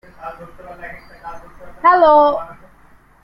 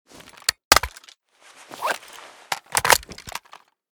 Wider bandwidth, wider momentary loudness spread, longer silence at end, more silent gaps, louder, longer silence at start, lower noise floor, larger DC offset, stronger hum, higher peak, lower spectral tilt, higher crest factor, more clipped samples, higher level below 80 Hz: second, 5.6 kHz vs over 20 kHz; first, 25 LU vs 21 LU; first, 0.7 s vs 0.55 s; second, none vs 0.65-0.71 s; first, -13 LUFS vs -21 LUFS; second, 0.25 s vs 0.5 s; second, -48 dBFS vs -52 dBFS; neither; neither; about the same, -2 dBFS vs 0 dBFS; first, -6 dB/octave vs -0.5 dB/octave; second, 16 dB vs 26 dB; neither; about the same, -48 dBFS vs -46 dBFS